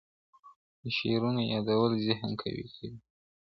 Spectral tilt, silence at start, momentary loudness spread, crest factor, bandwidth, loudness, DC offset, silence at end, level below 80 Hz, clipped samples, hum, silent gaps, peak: -8.5 dB/octave; 0.45 s; 16 LU; 22 dB; 6 kHz; -31 LUFS; under 0.1%; 0.45 s; -64 dBFS; under 0.1%; none; 0.56-0.83 s; -10 dBFS